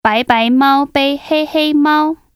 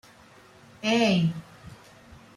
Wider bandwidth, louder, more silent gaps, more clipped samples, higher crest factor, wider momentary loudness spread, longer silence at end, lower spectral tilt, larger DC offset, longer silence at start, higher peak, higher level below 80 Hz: first, 15 kHz vs 12 kHz; first, -13 LUFS vs -24 LUFS; neither; neither; second, 12 dB vs 18 dB; second, 5 LU vs 26 LU; second, 0.2 s vs 0.65 s; about the same, -5 dB/octave vs -5.5 dB/octave; neither; second, 0.05 s vs 0.85 s; first, 0 dBFS vs -12 dBFS; first, -50 dBFS vs -62 dBFS